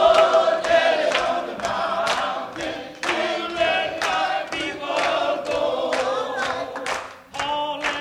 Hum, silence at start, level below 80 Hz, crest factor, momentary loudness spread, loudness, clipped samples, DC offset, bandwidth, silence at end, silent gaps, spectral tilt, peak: none; 0 s; -56 dBFS; 18 dB; 10 LU; -22 LUFS; under 0.1%; under 0.1%; 13.5 kHz; 0 s; none; -2.5 dB/octave; -4 dBFS